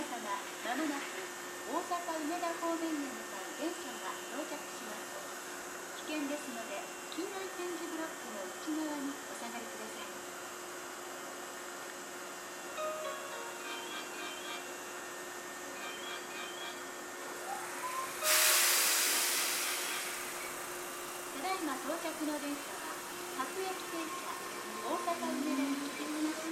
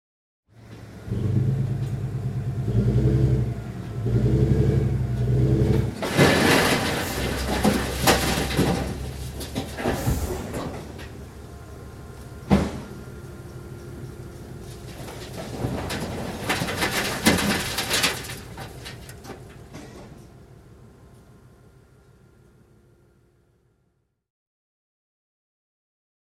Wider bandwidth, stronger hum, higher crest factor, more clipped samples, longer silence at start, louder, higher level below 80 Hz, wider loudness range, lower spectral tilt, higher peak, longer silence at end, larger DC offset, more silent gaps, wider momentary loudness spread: about the same, 16.5 kHz vs 16 kHz; neither; about the same, 24 dB vs 24 dB; neither; second, 0 s vs 0.6 s; second, -37 LUFS vs -24 LUFS; second, -80 dBFS vs -36 dBFS; about the same, 12 LU vs 13 LU; second, -0.5 dB/octave vs -5 dB/octave; second, -16 dBFS vs -2 dBFS; second, 0 s vs 4.85 s; neither; neither; second, 12 LU vs 20 LU